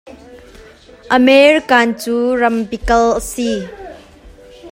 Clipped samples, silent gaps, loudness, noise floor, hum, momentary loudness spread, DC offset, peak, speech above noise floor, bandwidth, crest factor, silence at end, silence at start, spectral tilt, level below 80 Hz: under 0.1%; none; -13 LUFS; -40 dBFS; none; 15 LU; under 0.1%; 0 dBFS; 27 dB; 16 kHz; 16 dB; 0 s; 0.05 s; -4 dB/octave; -36 dBFS